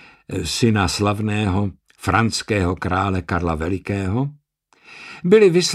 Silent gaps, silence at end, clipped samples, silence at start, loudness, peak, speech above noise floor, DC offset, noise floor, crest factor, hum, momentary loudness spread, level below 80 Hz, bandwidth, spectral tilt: none; 0 s; under 0.1%; 0.3 s; -20 LUFS; -2 dBFS; 36 dB; under 0.1%; -55 dBFS; 18 dB; none; 13 LU; -40 dBFS; 14.5 kHz; -5.5 dB/octave